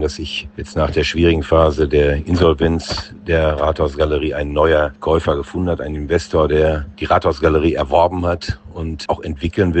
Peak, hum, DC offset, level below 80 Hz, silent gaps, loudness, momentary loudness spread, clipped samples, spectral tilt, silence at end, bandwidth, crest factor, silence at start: 0 dBFS; none; under 0.1%; -28 dBFS; none; -17 LUFS; 10 LU; under 0.1%; -6.5 dB/octave; 0 s; 8.6 kHz; 16 dB; 0 s